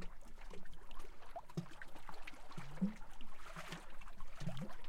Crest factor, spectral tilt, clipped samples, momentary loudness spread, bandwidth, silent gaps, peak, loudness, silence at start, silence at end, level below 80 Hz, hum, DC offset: 12 dB; -6 dB/octave; under 0.1%; 15 LU; 12 kHz; none; -28 dBFS; -51 LUFS; 0 s; 0 s; -54 dBFS; none; under 0.1%